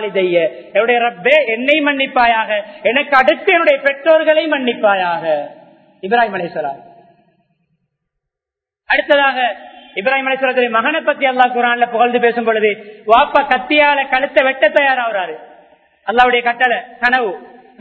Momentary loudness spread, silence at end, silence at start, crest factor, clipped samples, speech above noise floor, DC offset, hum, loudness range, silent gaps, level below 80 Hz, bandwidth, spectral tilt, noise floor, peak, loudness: 10 LU; 0.35 s; 0 s; 14 dB; under 0.1%; 71 dB; under 0.1%; none; 6 LU; none; -54 dBFS; 7.6 kHz; -5.5 dB/octave; -85 dBFS; 0 dBFS; -14 LUFS